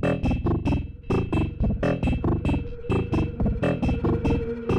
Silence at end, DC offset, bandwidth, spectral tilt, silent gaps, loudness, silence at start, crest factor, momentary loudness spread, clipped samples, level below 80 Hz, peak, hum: 0 s; under 0.1%; 9.4 kHz; -8.5 dB/octave; none; -25 LUFS; 0 s; 10 dB; 3 LU; under 0.1%; -32 dBFS; -14 dBFS; none